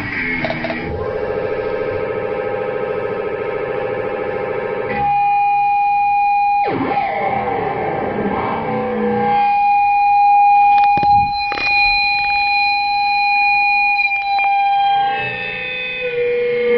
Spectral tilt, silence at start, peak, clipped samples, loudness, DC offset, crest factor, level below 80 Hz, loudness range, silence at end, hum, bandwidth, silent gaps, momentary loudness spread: -7 dB/octave; 0 s; -4 dBFS; under 0.1%; -16 LUFS; under 0.1%; 12 dB; -44 dBFS; 8 LU; 0 s; none; 5.8 kHz; none; 9 LU